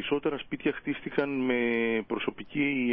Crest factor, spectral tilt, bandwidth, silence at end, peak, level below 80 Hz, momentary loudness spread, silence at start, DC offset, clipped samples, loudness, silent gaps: 16 dB; -9.5 dB/octave; 5 kHz; 0 s; -14 dBFS; -62 dBFS; 6 LU; 0 s; under 0.1%; under 0.1%; -30 LUFS; none